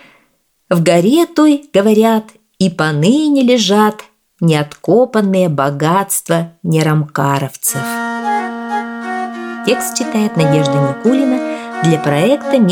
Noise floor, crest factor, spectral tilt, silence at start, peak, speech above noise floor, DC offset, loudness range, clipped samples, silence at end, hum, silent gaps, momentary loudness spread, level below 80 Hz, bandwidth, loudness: -59 dBFS; 14 dB; -5.5 dB/octave; 0.7 s; 0 dBFS; 47 dB; under 0.1%; 5 LU; under 0.1%; 0 s; none; none; 9 LU; -58 dBFS; 19.5 kHz; -14 LUFS